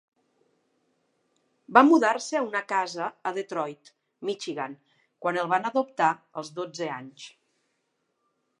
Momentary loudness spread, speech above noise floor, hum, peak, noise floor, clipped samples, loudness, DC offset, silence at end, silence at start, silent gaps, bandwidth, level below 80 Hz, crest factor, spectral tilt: 18 LU; 50 dB; none; -2 dBFS; -76 dBFS; under 0.1%; -26 LUFS; under 0.1%; 1.3 s; 1.7 s; none; 11 kHz; -84 dBFS; 26 dB; -4.5 dB/octave